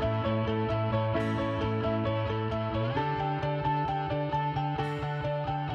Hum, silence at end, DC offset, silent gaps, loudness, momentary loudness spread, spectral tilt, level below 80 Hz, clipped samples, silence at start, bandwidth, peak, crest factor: none; 0 s; under 0.1%; none; -30 LUFS; 3 LU; -8.5 dB/octave; -48 dBFS; under 0.1%; 0 s; 6.8 kHz; -16 dBFS; 14 dB